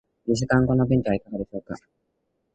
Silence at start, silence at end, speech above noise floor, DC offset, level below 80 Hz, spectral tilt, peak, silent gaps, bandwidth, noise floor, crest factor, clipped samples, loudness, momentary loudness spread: 0.25 s; 0.75 s; 51 dB; under 0.1%; -46 dBFS; -7 dB/octave; -6 dBFS; none; 8.6 kHz; -75 dBFS; 18 dB; under 0.1%; -23 LUFS; 16 LU